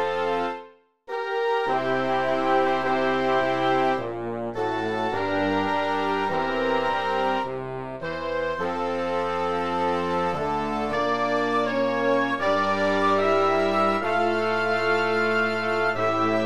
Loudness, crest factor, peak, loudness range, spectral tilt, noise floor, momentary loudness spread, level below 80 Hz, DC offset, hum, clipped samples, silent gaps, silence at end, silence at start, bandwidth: -24 LUFS; 14 dB; -10 dBFS; 4 LU; -5.5 dB/octave; -48 dBFS; 6 LU; -56 dBFS; 0.7%; none; under 0.1%; none; 0 s; 0 s; 12.5 kHz